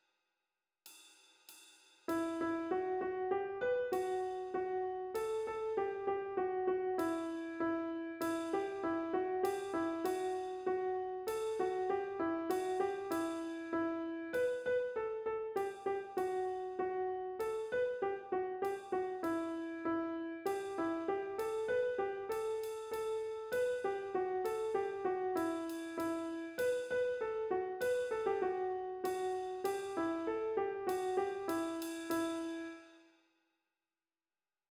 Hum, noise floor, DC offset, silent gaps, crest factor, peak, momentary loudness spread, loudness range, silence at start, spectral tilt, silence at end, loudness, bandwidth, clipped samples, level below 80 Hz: none; under -90 dBFS; under 0.1%; none; 16 dB; -22 dBFS; 4 LU; 1 LU; 0.85 s; -4.5 dB/octave; 1.7 s; -38 LUFS; over 20 kHz; under 0.1%; -74 dBFS